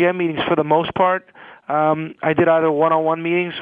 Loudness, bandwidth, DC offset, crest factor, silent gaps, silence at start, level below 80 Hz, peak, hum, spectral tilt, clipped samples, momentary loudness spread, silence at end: -18 LUFS; 4.1 kHz; under 0.1%; 16 dB; none; 0 s; -58 dBFS; -2 dBFS; none; -8.5 dB/octave; under 0.1%; 6 LU; 0 s